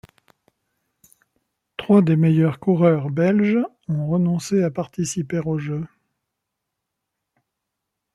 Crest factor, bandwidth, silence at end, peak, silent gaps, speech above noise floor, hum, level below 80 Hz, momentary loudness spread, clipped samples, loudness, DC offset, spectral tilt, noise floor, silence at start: 18 dB; 12 kHz; 2.3 s; -4 dBFS; none; 62 dB; none; -60 dBFS; 11 LU; under 0.1%; -20 LUFS; under 0.1%; -7.5 dB/octave; -81 dBFS; 1.8 s